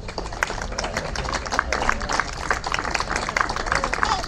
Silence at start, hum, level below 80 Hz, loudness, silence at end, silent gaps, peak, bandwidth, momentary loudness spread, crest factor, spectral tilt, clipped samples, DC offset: 0 s; none; -34 dBFS; -24 LUFS; 0 s; none; 0 dBFS; 15 kHz; 5 LU; 24 dB; -3 dB/octave; under 0.1%; under 0.1%